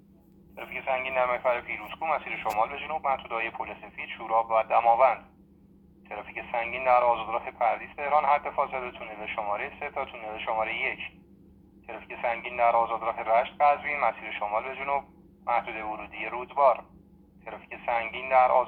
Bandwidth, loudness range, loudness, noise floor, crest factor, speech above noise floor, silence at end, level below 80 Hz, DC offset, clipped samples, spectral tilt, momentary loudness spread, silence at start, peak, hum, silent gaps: 17 kHz; 4 LU; -28 LUFS; -56 dBFS; 20 dB; 29 dB; 0 s; -60 dBFS; under 0.1%; under 0.1%; -5 dB/octave; 15 LU; 0.55 s; -8 dBFS; none; none